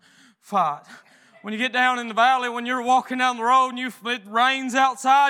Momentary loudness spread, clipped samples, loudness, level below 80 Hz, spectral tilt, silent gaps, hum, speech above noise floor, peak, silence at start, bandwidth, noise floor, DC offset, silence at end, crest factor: 9 LU; under 0.1%; -21 LUFS; under -90 dBFS; -2.5 dB/octave; none; none; 32 dB; -4 dBFS; 0.5 s; 15 kHz; -53 dBFS; under 0.1%; 0 s; 18 dB